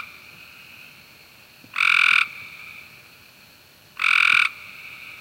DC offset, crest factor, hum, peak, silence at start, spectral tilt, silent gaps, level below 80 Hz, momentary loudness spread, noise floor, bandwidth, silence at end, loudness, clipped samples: under 0.1%; 20 dB; none; -4 dBFS; 0 s; 1 dB/octave; none; -70 dBFS; 26 LU; -51 dBFS; 17 kHz; 0.05 s; -17 LUFS; under 0.1%